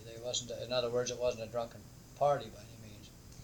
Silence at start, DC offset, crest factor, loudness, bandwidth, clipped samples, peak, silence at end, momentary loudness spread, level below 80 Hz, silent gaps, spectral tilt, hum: 0 s; under 0.1%; 20 dB; -36 LUFS; 19 kHz; under 0.1%; -18 dBFS; 0 s; 21 LU; -60 dBFS; none; -3.5 dB/octave; none